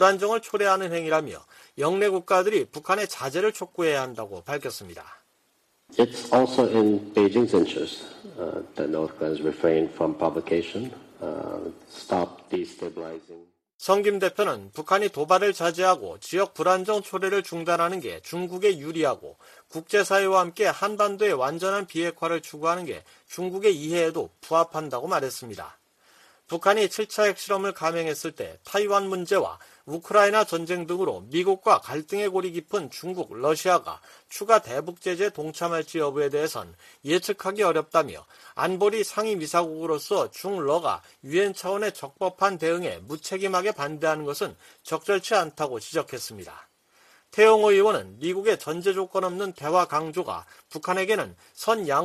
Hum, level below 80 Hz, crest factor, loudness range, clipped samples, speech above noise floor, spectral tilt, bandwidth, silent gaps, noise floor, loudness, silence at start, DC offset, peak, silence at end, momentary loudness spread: none; -68 dBFS; 22 dB; 4 LU; under 0.1%; 43 dB; -4 dB/octave; 14.5 kHz; 13.74-13.79 s; -68 dBFS; -25 LUFS; 0 s; under 0.1%; -4 dBFS; 0 s; 14 LU